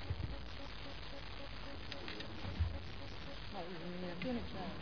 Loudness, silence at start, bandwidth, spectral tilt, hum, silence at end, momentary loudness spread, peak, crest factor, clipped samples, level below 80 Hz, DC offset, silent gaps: -46 LUFS; 0 s; 5.4 kHz; -4.5 dB/octave; none; 0 s; 7 LU; -26 dBFS; 18 dB; under 0.1%; -52 dBFS; 0.4%; none